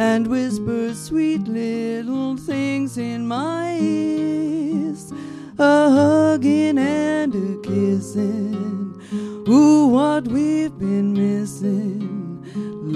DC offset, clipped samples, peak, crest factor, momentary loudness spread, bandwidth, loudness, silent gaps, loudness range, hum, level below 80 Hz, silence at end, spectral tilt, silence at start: under 0.1%; under 0.1%; -2 dBFS; 16 dB; 14 LU; 12 kHz; -20 LUFS; none; 5 LU; none; -56 dBFS; 0 s; -6.5 dB/octave; 0 s